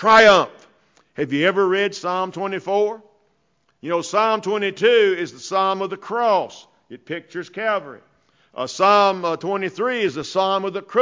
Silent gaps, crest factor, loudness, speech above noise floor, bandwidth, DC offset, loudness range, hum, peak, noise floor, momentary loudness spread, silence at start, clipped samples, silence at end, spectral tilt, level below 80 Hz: none; 16 dB; -19 LUFS; 47 dB; 7.6 kHz; under 0.1%; 4 LU; none; -4 dBFS; -66 dBFS; 15 LU; 0 s; under 0.1%; 0 s; -4 dB/octave; -64 dBFS